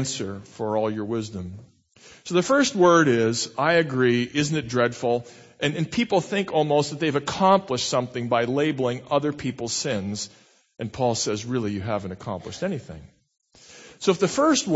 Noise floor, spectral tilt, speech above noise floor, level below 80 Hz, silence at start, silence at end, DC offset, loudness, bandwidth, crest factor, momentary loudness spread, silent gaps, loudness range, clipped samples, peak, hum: -49 dBFS; -4.5 dB/octave; 25 dB; -58 dBFS; 0 s; 0 s; under 0.1%; -23 LUFS; 8.2 kHz; 20 dB; 13 LU; none; 8 LU; under 0.1%; -4 dBFS; none